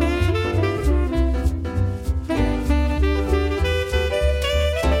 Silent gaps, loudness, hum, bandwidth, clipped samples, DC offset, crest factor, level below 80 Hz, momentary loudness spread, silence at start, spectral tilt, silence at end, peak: none; -21 LUFS; none; 14.5 kHz; under 0.1%; under 0.1%; 14 dB; -22 dBFS; 4 LU; 0 s; -6.5 dB/octave; 0 s; -6 dBFS